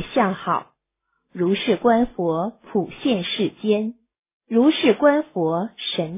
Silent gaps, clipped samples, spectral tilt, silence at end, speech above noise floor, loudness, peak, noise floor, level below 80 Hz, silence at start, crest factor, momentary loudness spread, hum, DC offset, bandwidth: 4.19-4.24 s, 4.33-4.40 s; under 0.1%; -10 dB/octave; 0 s; 55 dB; -21 LUFS; -4 dBFS; -75 dBFS; -54 dBFS; 0 s; 18 dB; 9 LU; none; under 0.1%; 3.9 kHz